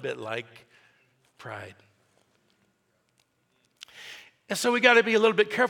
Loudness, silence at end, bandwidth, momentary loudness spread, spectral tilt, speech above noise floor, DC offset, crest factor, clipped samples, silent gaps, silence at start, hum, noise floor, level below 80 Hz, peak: -23 LUFS; 0 s; 18 kHz; 28 LU; -3 dB/octave; 47 dB; under 0.1%; 24 dB; under 0.1%; none; 0 s; none; -72 dBFS; -82 dBFS; -4 dBFS